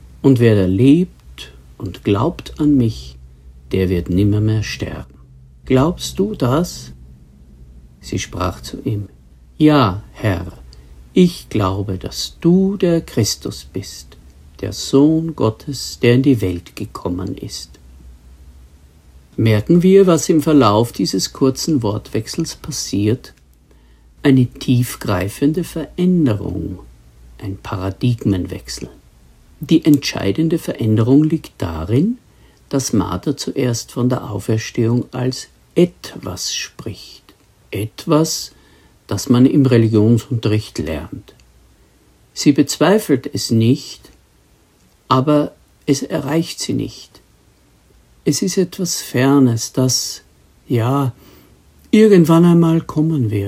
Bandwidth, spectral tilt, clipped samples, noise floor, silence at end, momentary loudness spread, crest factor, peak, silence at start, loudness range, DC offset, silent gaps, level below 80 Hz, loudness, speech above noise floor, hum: 16 kHz; -6 dB/octave; under 0.1%; -53 dBFS; 0 s; 16 LU; 18 dB; 0 dBFS; 0.05 s; 6 LU; under 0.1%; none; -42 dBFS; -16 LUFS; 37 dB; none